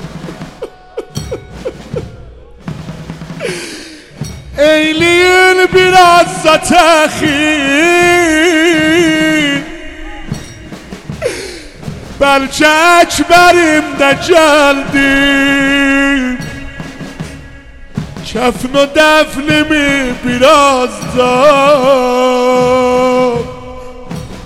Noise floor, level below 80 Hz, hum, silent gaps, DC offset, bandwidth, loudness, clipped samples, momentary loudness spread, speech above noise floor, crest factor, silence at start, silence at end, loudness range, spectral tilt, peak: -33 dBFS; -34 dBFS; none; none; under 0.1%; 17 kHz; -8 LUFS; under 0.1%; 20 LU; 25 dB; 10 dB; 0 s; 0 s; 10 LU; -3.5 dB/octave; 0 dBFS